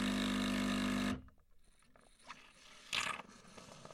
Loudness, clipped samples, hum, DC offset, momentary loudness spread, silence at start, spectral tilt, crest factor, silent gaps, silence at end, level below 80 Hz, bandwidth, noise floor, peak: -38 LUFS; under 0.1%; none; under 0.1%; 20 LU; 0 s; -4 dB/octave; 18 dB; none; 0 s; -58 dBFS; 15 kHz; -66 dBFS; -22 dBFS